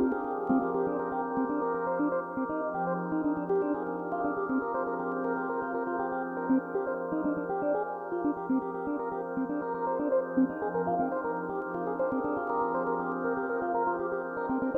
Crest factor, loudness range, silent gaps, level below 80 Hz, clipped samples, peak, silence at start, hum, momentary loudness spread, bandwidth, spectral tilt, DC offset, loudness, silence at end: 14 dB; 1 LU; none; -66 dBFS; under 0.1%; -16 dBFS; 0 s; none; 4 LU; 3.2 kHz; -10.5 dB/octave; under 0.1%; -31 LUFS; 0 s